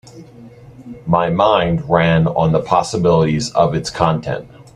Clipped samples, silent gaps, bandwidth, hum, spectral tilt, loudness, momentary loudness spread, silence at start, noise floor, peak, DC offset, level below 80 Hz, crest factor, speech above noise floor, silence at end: under 0.1%; none; 10.5 kHz; none; -6 dB/octave; -16 LUFS; 9 LU; 0.15 s; -39 dBFS; 0 dBFS; under 0.1%; -42 dBFS; 16 dB; 24 dB; 0.15 s